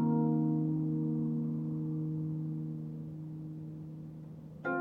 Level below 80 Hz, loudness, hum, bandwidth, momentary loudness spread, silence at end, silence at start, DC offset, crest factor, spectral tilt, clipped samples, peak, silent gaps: -68 dBFS; -35 LUFS; none; 2.6 kHz; 15 LU; 0 s; 0 s; under 0.1%; 14 dB; -11.5 dB/octave; under 0.1%; -22 dBFS; none